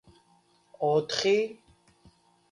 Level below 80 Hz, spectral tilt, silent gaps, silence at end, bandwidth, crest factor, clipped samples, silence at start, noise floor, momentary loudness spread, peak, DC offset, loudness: -70 dBFS; -4 dB/octave; none; 0.95 s; 11 kHz; 20 dB; under 0.1%; 0.8 s; -65 dBFS; 7 LU; -10 dBFS; under 0.1%; -27 LUFS